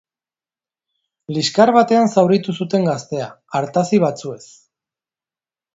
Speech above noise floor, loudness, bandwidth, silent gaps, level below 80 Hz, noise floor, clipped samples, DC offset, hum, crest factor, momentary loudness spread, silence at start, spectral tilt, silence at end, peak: over 73 dB; -17 LUFS; 8 kHz; none; -64 dBFS; under -90 dBFS; under 0.1%; under 0.1%; none; 18 dB; 14 LU; 1.3 s; -6 dB/octave; 1.35 s; 0 dBFS